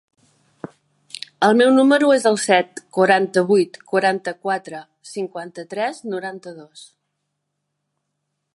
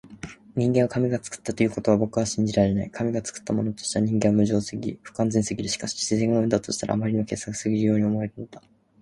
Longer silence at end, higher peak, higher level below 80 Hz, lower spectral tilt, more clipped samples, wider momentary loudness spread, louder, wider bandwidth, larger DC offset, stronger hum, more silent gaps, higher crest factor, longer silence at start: first, 1.75 s vs 0.4 s; first, -2 dBFS vs -6 dBFS; second, -74 dBFS vs -52 dBFS; about the same, -4.5 dB/octave vs -5.5 dB/octave; neither; first, 23 LU vs 10 LU; first, -18 LUFS vs -25 LUFS; about the same, 11.5 kHz vs 11.5 kHz; neither; neither; neither; about the same, 18 dB vs 20 dB; first, 1.4 s vs 0.05 s